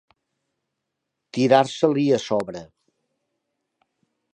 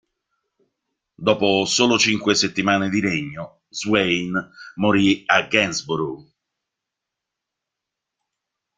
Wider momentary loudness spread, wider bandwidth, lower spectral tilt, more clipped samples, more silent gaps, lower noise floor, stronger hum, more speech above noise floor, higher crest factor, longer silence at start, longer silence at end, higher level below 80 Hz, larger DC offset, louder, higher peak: first, 16 LU vs 13 LU; first, 11 kHz vs 9.6 kHz; first, -6 dB/octave vs -3.5 dB/octave; neither; neither; about the same, -81 dBFS vs -84 dBFS; neither; about the same, 61 dB vs 64 dB; about the same, 22 dB vs 22 dB; first, 1.35 s vs 1.2 s; second, 1.7 s vs 2.55 s; second, -68 dBFS vs -58 dBFS; neither; about the same, -20 LUFS vs -19 LUFS; about the same, -4 dBFS vs -2 dBFS